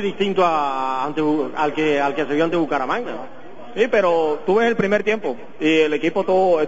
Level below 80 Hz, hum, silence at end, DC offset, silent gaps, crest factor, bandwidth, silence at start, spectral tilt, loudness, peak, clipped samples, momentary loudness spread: -58 dBFS; none; 0 s; 2%; none; 16 dB; 8 kHz; 0 s; -6 dB/octave; -19 LUFS; -4 dBFS; under 0.1%; 7 LU